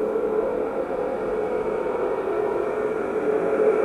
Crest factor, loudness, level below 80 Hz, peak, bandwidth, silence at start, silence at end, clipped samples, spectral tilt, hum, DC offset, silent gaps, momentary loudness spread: 14 dB; -25 LUFS; -54 dBFS; -10 dBFS; 10.5 kHz; 0 s; 0 s; under 0.1%; -7 dB/octave; none; under 0.1%; none; 4 LU